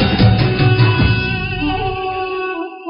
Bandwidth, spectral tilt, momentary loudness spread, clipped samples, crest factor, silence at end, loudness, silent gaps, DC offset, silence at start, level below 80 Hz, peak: 5.6 kHz; -5 dB/octave; 9 LU; under 0.1%; 14 dB; 0 s; -15 LUFS; none; under 0.1%; 0 s; -28 dBFS; 0 dBFS